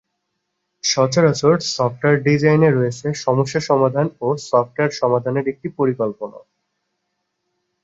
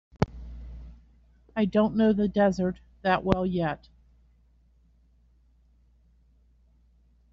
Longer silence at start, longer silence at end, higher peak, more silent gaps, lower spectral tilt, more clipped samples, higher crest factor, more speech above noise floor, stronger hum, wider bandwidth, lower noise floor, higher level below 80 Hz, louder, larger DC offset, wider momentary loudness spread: first, 0.85 s vs 0.2 s; second, 1.45 s vs 3.55 s; about the same, -2 dBFS vs -4 dBFS; neither; about the same, -5.5 dB/octave vs -6 dB/octave; neither; second, 16 dB vs 26 dB; first, 57 dB vs 37 dB; neither; about the same, 8 kHz vs 7.4 kHz; first, -75 dBFS vs -62 dBFS; second, -60 dBFS vs -48 dBFS; first, -18 LUFS vs -26 LUFS; neither; second, 8 LU vs 21 LU